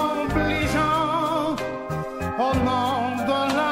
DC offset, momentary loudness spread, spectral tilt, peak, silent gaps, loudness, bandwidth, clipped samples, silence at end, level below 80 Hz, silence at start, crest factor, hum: under 0.1%; 7 LU; -5.5 dB/octave; -10 dBFS; none; -23 LUFS; 16 kHz; under 0.1%; 0 s; -40 dBFS; 0 s; 14 dB; none